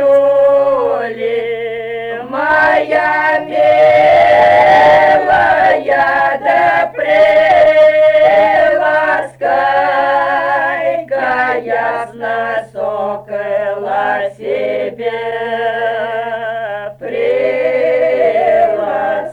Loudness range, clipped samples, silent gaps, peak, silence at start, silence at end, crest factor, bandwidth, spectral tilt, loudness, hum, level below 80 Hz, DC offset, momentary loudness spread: 9 LU; under 0.1%; none; -2 dBFS; 0 s; 0 s; 10 dB; 9.4 kHz; -5 dB/octave; -12 LUFS; none; -48 dBFS; under 0.1%; 12 LU